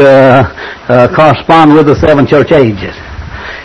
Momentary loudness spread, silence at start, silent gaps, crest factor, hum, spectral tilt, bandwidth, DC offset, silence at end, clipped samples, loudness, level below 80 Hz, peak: 18 LU; 0 s; none; 6 dB; none; -7.5 dB/octave; 9.8 kHz; under 0.1%; 0 s; 7%; -6 LUFS; -30 dBFS; 0 dBFS